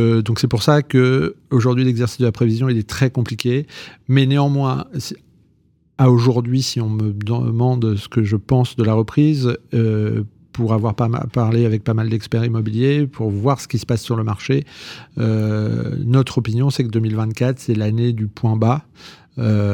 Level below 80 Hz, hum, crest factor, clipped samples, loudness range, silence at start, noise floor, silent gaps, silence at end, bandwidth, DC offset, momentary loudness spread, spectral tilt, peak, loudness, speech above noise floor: -52 dBFS; none; 16 dB; under 0.1%; 2 LU; 0 s; -58 dBFS; none; 0 s; 13 kHz; under 0.1%; 7 LU; -7.5 dB/octave; -2 dBFS; -18 LUFS; 41 dB